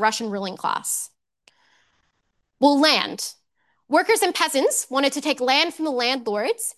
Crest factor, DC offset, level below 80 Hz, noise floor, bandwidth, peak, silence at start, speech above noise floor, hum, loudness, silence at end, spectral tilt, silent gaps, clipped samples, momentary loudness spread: 18 dB; under 0.1%; -76 dBFS; -72 dBFS; 13 kHz; -4 dBFS; 0 s; 51 dB; none; -21 LUFS; 0.05 s; -1.5 dB/octave; none; under 0.1%; 10 LU